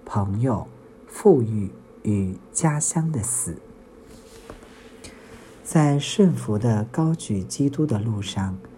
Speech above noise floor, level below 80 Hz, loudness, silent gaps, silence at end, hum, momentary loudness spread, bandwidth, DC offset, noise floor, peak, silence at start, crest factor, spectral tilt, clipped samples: 24 dB; -54 dBFS; -23 LUFS; none; 0 s; none; 23 LU; 16 kHz; under 0.1%; -46 dBFS; -4 dBFS; 0.05 s; 20 dB; -6 dB/octave; under 0.1%